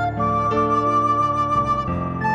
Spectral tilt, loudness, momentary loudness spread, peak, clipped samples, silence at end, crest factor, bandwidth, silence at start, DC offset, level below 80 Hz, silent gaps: -7.5 dB/octave; -20 LUFS; 4 LU; -8 dBFS; under 0.1%; 0 s; 12 dB; 8.8 kHz; 0 s; under 0.1%; -40 dBFS; none